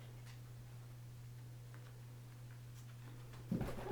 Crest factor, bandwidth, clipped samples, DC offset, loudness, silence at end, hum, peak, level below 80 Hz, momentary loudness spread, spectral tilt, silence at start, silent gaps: 22 dB; over 20 kHz; under 0.1%; under 0.1%; -51 LUFS; 0 s; none; -28 dBFS; -60 dBFS; 11 LU; -7 dB/octave; 0 s; none